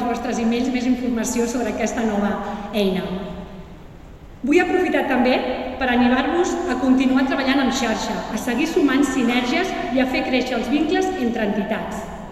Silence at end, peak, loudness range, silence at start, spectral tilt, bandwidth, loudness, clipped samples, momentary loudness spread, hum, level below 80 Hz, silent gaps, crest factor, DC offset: 0 s; -4 dBFS; 4 LU; 0 s; -4.5 dB/octave; 13.5 kHz; -20 LUFS; under 0.1%; 8 LU; none; -42 dBFS; none; 16 dB; under 0.1%